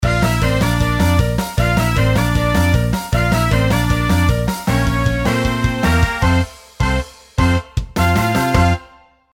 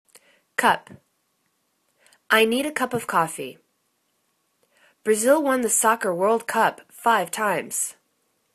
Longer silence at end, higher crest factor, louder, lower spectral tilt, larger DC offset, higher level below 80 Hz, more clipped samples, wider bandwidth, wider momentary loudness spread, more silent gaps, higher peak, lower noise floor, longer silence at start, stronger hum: second, 0.5 s vs 0.65 s; second, 14 dB vs 22 dB; first, -16 LUFS vs -22 LUFS; first, -6 dB/octave vs -2.5 dB/octave; neither; first, -24 dBFS vs -72 dBFS; neither; first, 17.5 kHz vs 14 kHz; second, 4 LU vs 9 LU; neither; about the same, 0 dBFS vs -2 dBFS; second, -46 dBFS vs -71 dBFS; second, 0 s vs 0.6 s; neither